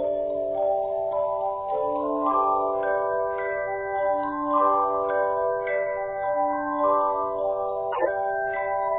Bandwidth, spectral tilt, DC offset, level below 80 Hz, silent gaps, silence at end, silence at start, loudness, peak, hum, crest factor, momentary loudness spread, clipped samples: 3.9 kHz; -9.5 dB/octave; under 0.1%; -58 dBFS; none; 0 s; 0 s; -25 LUFS; -10 dBFS; none; 16 dB; 5 LU; under 0.1%